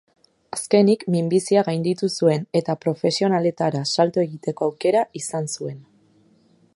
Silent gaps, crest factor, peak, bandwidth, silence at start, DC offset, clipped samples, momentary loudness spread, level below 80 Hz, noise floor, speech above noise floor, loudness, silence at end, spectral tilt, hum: none; 18 dB; -4 dBFS; 11.5 kHz; 0.55 s; under 0.1%; under 0.1%; 10 LU; -68 dBFS; -58 dBFS; 37 dB; -21 LUFS; 0.95 s; -5.5 dB/octave; none